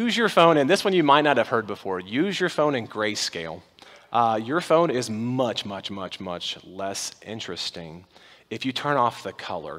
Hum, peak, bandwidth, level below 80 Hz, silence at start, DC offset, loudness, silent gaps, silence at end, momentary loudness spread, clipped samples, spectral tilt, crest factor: none; -2 dBFS; 16 kHz; -68 dBFS; 0 s; under 0.1%; -24 LUFS; none; 0 s; 15 LU; under 0.1%; -4.5 dB/octave; 22 dB